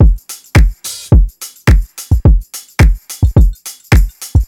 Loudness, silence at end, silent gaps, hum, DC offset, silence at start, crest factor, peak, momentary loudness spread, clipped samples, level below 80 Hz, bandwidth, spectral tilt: -13 LUFS; 0 s; none; none; under 0.1%; 0 s; 10 dB; 0 dBFS; 9 LU; under 0.1%; -12 dBFS; 16.5 kHz; -6 dB/octave